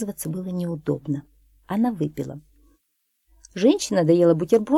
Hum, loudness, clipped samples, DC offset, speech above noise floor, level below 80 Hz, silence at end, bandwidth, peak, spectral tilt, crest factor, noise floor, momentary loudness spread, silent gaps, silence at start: none; -23 LUFS; under 0.1%; under 0.1%; 52 dB; -58 dBFS; 0 s; 16 kHz; -6 dBFS; -6.5 dB/octave; 18 dB; -73 dBFS; 15 LU; none; 0 s